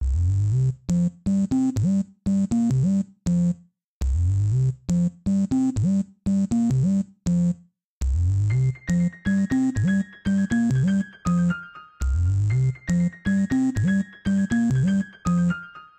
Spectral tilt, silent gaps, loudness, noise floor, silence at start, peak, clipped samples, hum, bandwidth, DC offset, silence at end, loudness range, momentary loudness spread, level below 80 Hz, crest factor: -8 dB/octave; 3.84-4.01 s, 7.84-8.01 s; -23 LUFS; -43 dBFS; 0 s; -14 dBFS; under 0.1%; none; 9 kHz; under 0.1%; 0.15 s; 1 LU; 4 LU; -34 dBFS; 8 dB